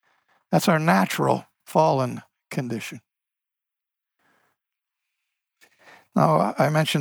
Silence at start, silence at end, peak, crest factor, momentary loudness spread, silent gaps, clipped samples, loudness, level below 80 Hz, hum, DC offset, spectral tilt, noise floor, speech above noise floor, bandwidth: 0.5 s; 0 s; -4 dBFS; 20 dB; 12 LU; none; under 0.1%; -22 LUFS; -72 dBFS; none; under 0.1%; -6 dB/octave; -88 dBFS; 67 dB; over 20 kHz